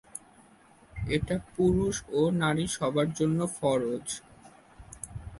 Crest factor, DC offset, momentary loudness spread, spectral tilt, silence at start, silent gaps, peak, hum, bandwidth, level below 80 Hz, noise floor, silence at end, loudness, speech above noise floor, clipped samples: 16 dB; under 0.1%; 17 LU; -5.5 dB/octave; 0.15 s; none; -14 dBFS; none; 11.5 kHz; -48 dBFS; -58 dBFS; 0 s; -29 LUFS; 30 dB; under 0.1%